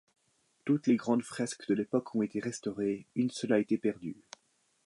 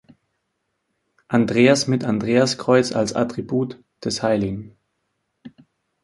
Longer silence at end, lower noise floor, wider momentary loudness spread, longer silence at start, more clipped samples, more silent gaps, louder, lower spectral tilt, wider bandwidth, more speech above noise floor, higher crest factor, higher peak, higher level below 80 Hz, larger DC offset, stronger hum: first, 0.75 s vs 0.55 s; about the same, -74 dBFS vs -75 dBFS; about the same, 10 LU vs 12 LU; second, 0.65 s vs 1.3 s; neither; neither; second, -32 LUFS vs -20 LUFS; about the same, -6 dB/octave vs -5 dB/octave; about the same, 11.5 kHz vs 11.5 kHz; second, 42 dB vs 55 dB; about the same, 18 dB vs 20 dB; second, -14 dBFS vs -2 dBFS; second, -76 dBFS vs -56 dBFS; neither; neither